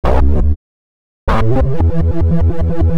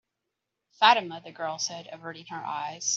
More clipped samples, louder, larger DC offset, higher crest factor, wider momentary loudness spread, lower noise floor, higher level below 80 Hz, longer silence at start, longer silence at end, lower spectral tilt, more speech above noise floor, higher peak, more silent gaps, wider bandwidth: neither; first, -16 LUFS vs -26 LUFS; neither; second, 12 dB vs 24 dB; second, 5 LU vs 19 LU; first, under -90 dBFS vs -84 dBFS; first, -16 dBFS vs -82 dBFS; second, 0.05 s vs 0.8 s; about the same, 0 s vs 0 s; first, -9.5 dB/octave vs -0.5 dB/octave; first, over 79 dB vs 56 dB; first, 0 dBFS vs -4 dBFS; first, 0.56-1.27 s vs none; second, 5.8 kHz vs 8 kHz